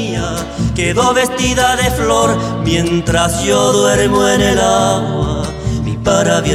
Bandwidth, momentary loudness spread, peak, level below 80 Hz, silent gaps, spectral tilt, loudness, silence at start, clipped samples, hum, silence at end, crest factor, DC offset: 16 kHz; 7 LU; 0 dBFS; -28 dBFS; none; -4.5 dB/octave; -13 LUFS; 0 s; under 0.1%; none; 0 s; 12 dB; under 0.1%